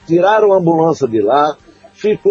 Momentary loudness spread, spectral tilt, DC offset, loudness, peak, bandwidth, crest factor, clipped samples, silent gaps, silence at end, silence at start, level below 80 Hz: 8 LU; -7 dB/octave; under 0.1%; -13 LUFS; 0 dBFS; 7.6 kHz; 12 dB; under 0.1%; none; 0 s; 0.1 s; -56 dBFS